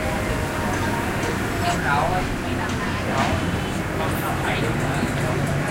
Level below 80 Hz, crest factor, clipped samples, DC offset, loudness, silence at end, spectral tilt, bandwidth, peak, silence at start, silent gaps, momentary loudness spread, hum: -34 dBFS; 14 dB; under 0.1%; under 0.1%; -23 LUFS; 0 s; -5.5 dB/octave; 16 kHz; -8 dBFS; 0 s; none; 4 LU; none